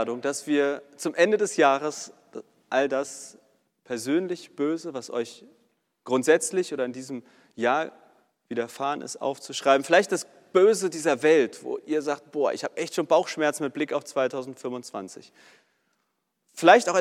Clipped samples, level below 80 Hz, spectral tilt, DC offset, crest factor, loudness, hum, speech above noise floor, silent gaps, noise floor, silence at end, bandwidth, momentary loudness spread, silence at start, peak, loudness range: under 0.1%; -86 dBFS; -3.5 dB/octave; under 0.1%; 24 dB; -25 LUFS; none; 52 dB; none; -77 dBFS; 0 s; 15 kHz; 16 LU; 0 s; -2 dBFS; 7 LU